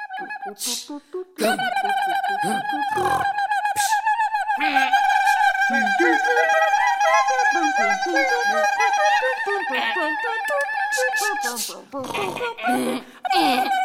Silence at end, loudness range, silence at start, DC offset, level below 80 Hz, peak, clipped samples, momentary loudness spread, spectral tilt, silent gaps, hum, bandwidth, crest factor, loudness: 0 s; 5 LU; 0 s; under 0.1%; -66 dBFS; -4 dBFS; under 0.1%; 9 LU; -2 dB/octave; none; none; 16.5 kHz; 16 dB; -20 LUFS